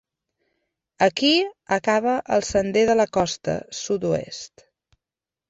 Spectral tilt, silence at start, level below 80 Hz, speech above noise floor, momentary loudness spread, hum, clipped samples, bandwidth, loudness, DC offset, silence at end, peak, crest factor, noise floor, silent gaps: -4 dB/octave; 1 s; -54 dBFS; 68 dB; 9 LU; none; under 0.1%; 8.2 kHz; -22 LUFS; under 0.1%; 1.05 s; -6 dBFS; 18 dB; -89 dBFS; none